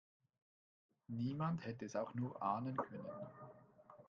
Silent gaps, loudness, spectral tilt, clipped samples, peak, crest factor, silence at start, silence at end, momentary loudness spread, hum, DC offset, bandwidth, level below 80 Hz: none; -44 LUFS; -8 dB/octave; under 0.1%; -26 dBFS; 20 dB; 1.1 s; 0.05 s; 18 LU; none; under 0.1%; 7.4 kHz; -82 dBFS